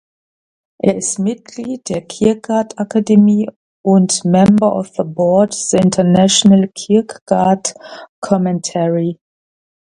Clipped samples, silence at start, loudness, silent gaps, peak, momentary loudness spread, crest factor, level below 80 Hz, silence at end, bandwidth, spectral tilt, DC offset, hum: under 0.1%; 0.85 s; -14 LUFS; 3.56-3.84 s, 7.21-7.26 s, 8.09-8.22 s; 0 dBFS; 13 LU; 14 dB; -50 dBFS; 0.8 s; 11 kHz; -5.5 dB/octave; under 0.1%; none